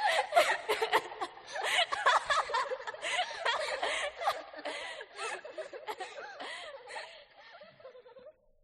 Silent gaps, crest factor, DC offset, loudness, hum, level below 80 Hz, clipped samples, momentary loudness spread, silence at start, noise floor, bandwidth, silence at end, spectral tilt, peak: none; 22 dB; under 0.1%; -33 LUFS; none; -72 dBFS; under 0.1%; 22 LU; 0 s; -56 dBFS; 13 kHz; 0.3 s; 0 dB/octave; -12 dBFS